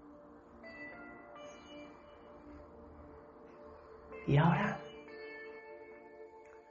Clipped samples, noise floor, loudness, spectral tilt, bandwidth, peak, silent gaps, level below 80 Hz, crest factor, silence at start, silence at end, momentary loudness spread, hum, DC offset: under 0.1%; -56 dBFS; -36 LUFS; -6.5 dB/octave; 7 kHz; -18 dBFS; none; -64 dBFS; 22 dB; 0 s; 0.1 s; 25 LU; none; under 0.1%